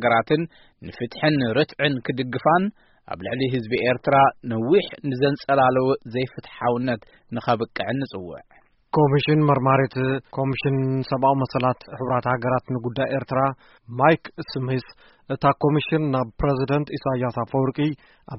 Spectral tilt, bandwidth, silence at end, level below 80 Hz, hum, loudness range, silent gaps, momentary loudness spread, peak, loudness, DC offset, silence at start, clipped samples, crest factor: -5.5 dB/octave; 5.8 kHz; 0 s; -50 dBFS; none; 3 LU; none; 12 LU; -2 dBFS; -22 LUFS; under 0.1%; 0 s; under 0.1%; 20 dB